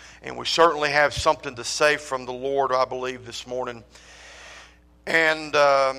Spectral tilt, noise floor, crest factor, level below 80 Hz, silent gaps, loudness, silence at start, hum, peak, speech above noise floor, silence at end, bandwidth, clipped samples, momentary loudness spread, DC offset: -2.5 dB/octave; -49 dBFS; 18 dB; -52 dBFS; none; -22 LUFS; 0 s; none; -4 dBFS; 27 dB; 0 s; 15.5 kHz; under 0.1%; 21 LU; under 0.1%